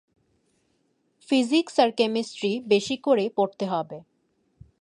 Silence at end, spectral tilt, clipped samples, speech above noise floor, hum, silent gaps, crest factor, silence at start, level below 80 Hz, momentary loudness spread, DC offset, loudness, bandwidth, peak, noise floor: 0.8 s; -4.5 dB/octave; under 0.1%; 47 dB; none; none; 20 dB; 1.3 s; -68 dBFS; 7 LU; under 0.1%; -24 LUFS; 11 kHz; -6 dBFS; -70 dBFS